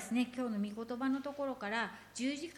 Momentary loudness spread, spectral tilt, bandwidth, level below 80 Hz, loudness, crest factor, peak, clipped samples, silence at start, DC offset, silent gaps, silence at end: 4 LU; -4.5 dB/octave; 14.5 kHz; -74 dBFS; -38 LUFS; 16 dB; -22 dBFS; under 0.1%; 0 s; under 0.1%; none; 0 s